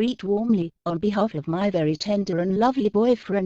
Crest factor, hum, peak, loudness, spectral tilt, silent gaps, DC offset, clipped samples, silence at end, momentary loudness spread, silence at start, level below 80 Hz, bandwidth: 14 dB; none; -8 dBFS; -23 LUFS; -7 dB/octave; none; under 0.1%; under 0.1%; 0 s; 4 LU; 0 s; -56 dBFS; 7.6 kHz